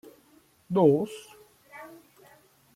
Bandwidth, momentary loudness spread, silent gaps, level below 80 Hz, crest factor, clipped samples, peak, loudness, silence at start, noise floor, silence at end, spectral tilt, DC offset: 15.5 kHz; 26 LU; none; -72 dBFS; 22 dB; under 0.1%; -8 dBFS; -25 LUFS; 0.7 s; -61 dBFS; 0.9 s; -8 dB/octave; under 0.1%